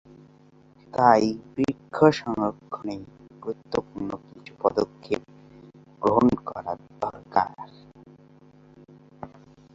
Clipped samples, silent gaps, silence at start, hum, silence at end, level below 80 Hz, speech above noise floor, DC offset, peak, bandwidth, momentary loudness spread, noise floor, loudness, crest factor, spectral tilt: under 0.1%; none; 0.95 s; none; 0.5 s; -58 dBFS; 31 dB; under 0.1%; -2 dBFS; 7.8 kHz; 20 LU; -55 dBFS; -25 LUFS; 24 dB; -7 dB/octave